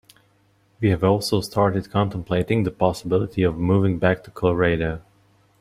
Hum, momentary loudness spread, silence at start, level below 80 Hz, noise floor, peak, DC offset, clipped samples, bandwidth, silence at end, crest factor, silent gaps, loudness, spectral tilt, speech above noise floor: none; 5 LU; 0.8 s; -46 dBFS; -61 dBFS; -2 dBFS; under 0.1%; under 0.1%; 15 kHz; 0.6 s; 20 dB; none; -22 LUFS; -7 dB/octave; 40 dB